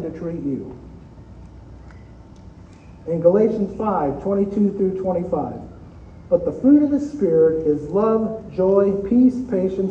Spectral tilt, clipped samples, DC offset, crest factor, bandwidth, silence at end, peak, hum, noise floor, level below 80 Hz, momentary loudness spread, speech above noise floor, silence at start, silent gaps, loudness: -10 dB/octave; under 0.1%; under 0.1%; 18 dB; 7.8 kHz; 0 s; -2 dBFS; none; -42 dBFS; -46 dBFS; 12 LU; 24 dB; 0 s; none; -19 LUFS